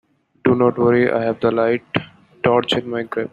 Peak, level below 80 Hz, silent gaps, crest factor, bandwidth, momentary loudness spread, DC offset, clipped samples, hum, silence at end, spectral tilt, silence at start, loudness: -2 dBFS; -56 dBFS; none; 16 dB; 8.8 kHz; 9 LU; under 0.1%; under 0.1%; none; 0.05 s; -7 dB/octave; 0.45 s; -18 LUFS